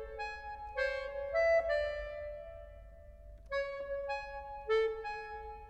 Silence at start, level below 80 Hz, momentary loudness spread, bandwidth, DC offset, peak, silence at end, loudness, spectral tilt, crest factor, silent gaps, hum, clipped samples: 0 s; -54 dBFS; 23 LU; 8.4 kHz; under 0.1%; -22 dBFS; 0 s; -36 LUFS; -3.5 dB/octave; 16 dB; none; none; under 0.1%